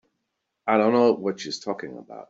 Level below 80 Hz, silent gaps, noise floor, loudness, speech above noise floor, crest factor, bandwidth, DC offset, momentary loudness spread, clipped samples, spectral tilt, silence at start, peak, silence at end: -72 dBFS; none; -79 dBFS; -23 LUFS; 56 dB; 20 dB; 7.8 kHz; under 0.1%; 14 LU; under 0.1%; -5 dB/octave; 0.65 s; -6 dBFS; 0.1 s